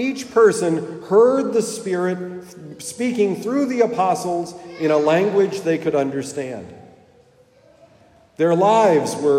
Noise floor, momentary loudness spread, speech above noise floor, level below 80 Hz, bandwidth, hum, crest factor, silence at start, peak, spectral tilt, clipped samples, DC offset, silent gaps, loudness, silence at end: -53 dBFS; 15 LU; 34 dB; -66 dBFS; 15 kHz; none; 16 dB; 0 s; -4 dBFS; -5.5 dB/octave; under 0.1%; under 0.1%; none; -19 LUFS; 0 s